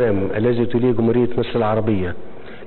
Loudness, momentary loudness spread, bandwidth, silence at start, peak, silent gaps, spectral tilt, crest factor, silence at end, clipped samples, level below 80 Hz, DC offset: -19 LUFS; 10 LU; 4.3 kHz; 0 s; -6 dBFS; none; -12.5 dB/octave; 14 dB; 0 s; under 0.1%; -38 dBFS; 4%